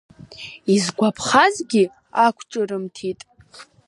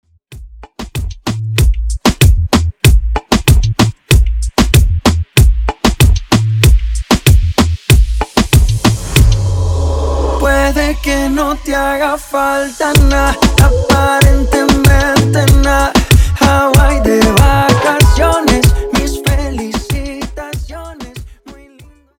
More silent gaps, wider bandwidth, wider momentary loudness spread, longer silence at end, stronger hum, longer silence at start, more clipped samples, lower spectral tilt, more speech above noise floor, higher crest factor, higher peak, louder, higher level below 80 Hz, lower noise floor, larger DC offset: neither; second, 11.5 kHz vs 19.5 kHz; first, 15 LU vs 10 LU; second, 0.25 s vs 0.65 s; neither; about the same, 0.3 s vs 0.3 s; neither; about the same, -4 dB/octave vs -5 dB/octave; second, 27 dB vs 32 dB; first, 20 dB vs 10 dB; about the same, -2 dBFS vs 0 dBFS; second, -20 LUFS vs -11 LUFS; second, -60 dBFS vs -14 dBFS; first, -46 dBFS vs -42 dBFS; neither